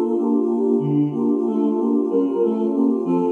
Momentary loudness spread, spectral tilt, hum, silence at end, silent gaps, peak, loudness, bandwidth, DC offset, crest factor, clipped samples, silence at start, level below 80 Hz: 1 LU; -11 dB/octave; none; 0 s; none; -8 dBFS; -20 LUFS; 3.4 kHz; under 0.1%; 12 dB; under 0.1%; 0 s; -78 dBFS